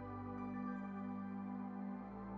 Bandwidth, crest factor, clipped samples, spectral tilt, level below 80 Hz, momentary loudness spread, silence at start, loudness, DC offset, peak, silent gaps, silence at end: 5 kHz; 12 dB; under 0.1%; -8.5 dB/octave; -68 dBFS; 3 LU; 0 s; -46 LUFS; under 0.1%; -34 dBFS; none; 0 s